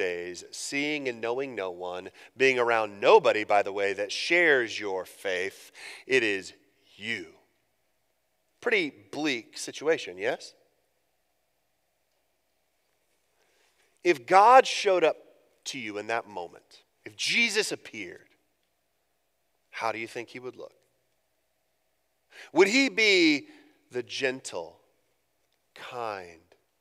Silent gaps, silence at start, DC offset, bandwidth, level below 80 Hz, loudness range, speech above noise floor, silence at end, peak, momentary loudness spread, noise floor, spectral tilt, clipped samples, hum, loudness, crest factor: none; 0 s; under 0.1%; 15 kHz; -82 dBFS; 14 LU; 50 dB; 0.5 s; -4 dBFS; 20 LU; -76 dBFS; -2.5 dB/octave; under 0.1%; none; -26 LUFS; 24 dB